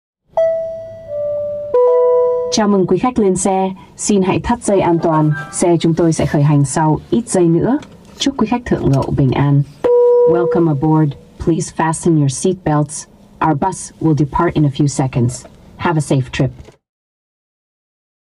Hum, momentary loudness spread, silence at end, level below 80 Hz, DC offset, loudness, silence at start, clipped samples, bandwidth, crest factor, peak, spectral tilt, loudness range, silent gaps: none; 8 LU; 1.65 s; -40 dBFS; under 0.1%; -15 LUFS; 0.35 s; under 0.1%; 12 kHz; 10 dB; -4 dBFS; -6.5 dB/octave; 3 LU; none